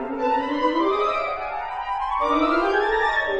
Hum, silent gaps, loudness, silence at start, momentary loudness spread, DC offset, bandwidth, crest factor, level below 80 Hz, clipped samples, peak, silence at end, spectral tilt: none; none; -22 LUFS; 0 s; 8 LU; under 0.1%; 8.8 kHz; 16 dB; -46 dBFS; under 0.1%; -8 dBFS; 0 s; -4.5 dB/octave